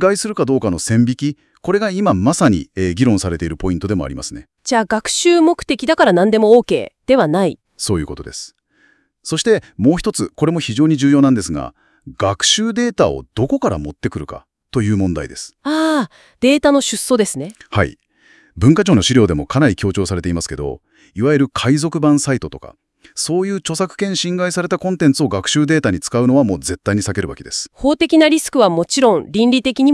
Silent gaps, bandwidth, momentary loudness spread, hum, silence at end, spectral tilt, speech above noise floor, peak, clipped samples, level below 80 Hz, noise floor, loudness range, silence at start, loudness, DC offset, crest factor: none; 12 kHz; 12 LU; none; 0 s; -5 dB/octave; 41 dB; 0 dBFS; under 0.1%; -42 dBFS; -56 dBFS; 4 LU; 0 s; -16 LUFS; under 0.1%; 16 dB